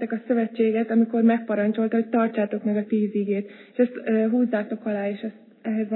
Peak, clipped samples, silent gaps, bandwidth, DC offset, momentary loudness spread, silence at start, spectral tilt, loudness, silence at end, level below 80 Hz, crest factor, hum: -8 dBFS; under 0.1%; none; 4.1 kHz; under 0.1%; 8 LU; 0 s; -11.5 dB/octave; -24 LUFS; 0 s; -88 dBFS; 14 dB; none